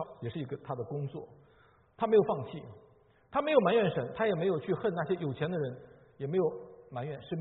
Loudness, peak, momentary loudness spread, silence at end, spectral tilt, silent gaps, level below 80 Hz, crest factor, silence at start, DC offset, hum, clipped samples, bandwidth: -32 LUFS; -10 dBFS; 17 LU; 0 s; -6 dB/octave; none; -68 dBFS; 22 dB; 0 s; under 0.1%; none; under 0.1%; 4.1 kHz